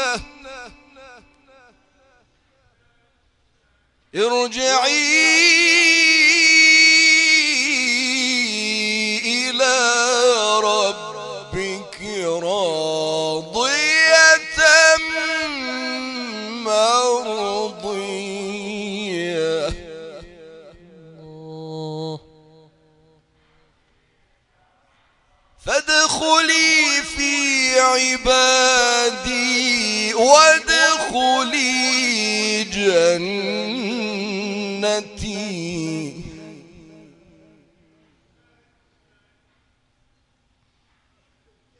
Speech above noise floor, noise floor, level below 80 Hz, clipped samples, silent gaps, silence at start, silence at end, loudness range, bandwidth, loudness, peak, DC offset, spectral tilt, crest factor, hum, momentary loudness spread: 49 dB; -65 dBFS; -50 dBFS; under 0.1%; none; 0 s; 5.25 s; 19 LU; 11 kHz; -16 LUFS; 0 dBFS; under 0.1%; -1 dB/octave; 20 dB; none; 18 LU